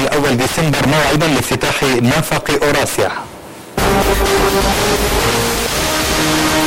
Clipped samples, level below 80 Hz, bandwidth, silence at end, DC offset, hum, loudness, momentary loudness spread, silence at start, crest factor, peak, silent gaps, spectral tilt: under 0.1%; -28 dBFS; 16.5 kHz; 0 s; under 0.1%; none; -14 LUFS; 5 LU; 0 s; 12 dB; -4 dBFS; none; -4 dB/octave